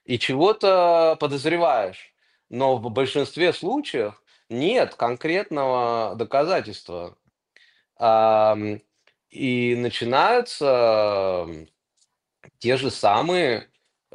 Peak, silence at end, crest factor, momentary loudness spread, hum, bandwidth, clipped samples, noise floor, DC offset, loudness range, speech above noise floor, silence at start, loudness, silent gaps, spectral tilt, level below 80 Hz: -4 dBFS; 0.5 s; 18 dB; 13 LU; none; 11 kHz; under 0.1%; -69 dBFS; under 0.1%; 3 LU; 48 dB; 0.1 s; -21 LUFS; none; -5.5 dB/octave; -64 dBFS